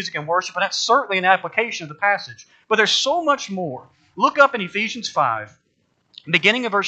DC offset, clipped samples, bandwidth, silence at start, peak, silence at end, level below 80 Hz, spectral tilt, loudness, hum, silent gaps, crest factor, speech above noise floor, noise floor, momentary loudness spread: under 0.1%; under 0.1%; 8.8 kHz; 0 s; 0 dBFS; 0 s; -76 dBFS; -2.5 dB/octave; -19 LUFS; none; none; 20 dB; 47 dB; -67 dBFS; 12 LU